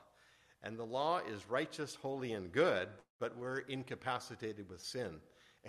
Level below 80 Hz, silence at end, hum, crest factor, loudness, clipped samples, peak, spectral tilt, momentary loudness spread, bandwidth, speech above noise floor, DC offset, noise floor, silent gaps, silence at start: -76 dBFS; 0 s; none; 22 dB; -40 LUFS; under 0.1%; -18 dBFS; -5 dB/octave; 13 LU; 13 kHz; 29 dB; under 0.1%; -68 dBFS; 3.10-3.19 s; 0 s